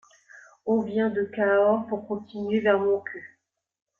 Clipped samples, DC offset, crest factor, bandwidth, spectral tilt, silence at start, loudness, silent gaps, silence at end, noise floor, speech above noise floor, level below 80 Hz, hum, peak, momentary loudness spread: under 0.1%; under 0.1%; 18 dB; 6.8 kHz; -7.5 dB/octave; 0.35 s; -25 LUFS; none; 0.75 s; -52 dBFS; 28 dB; -70 dBFS; none; -8 dBFS; 13 LU